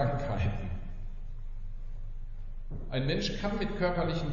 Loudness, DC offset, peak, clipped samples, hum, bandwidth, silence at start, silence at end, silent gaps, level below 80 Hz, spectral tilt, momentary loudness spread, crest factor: -33 LUFS; under 0.1%; -18 dBFS; under 0.1%; none; 7.2 kHz; 0 s; 0 s; none; -36 dBFS; -5.5 dB/octave; 16 LU; 14 dB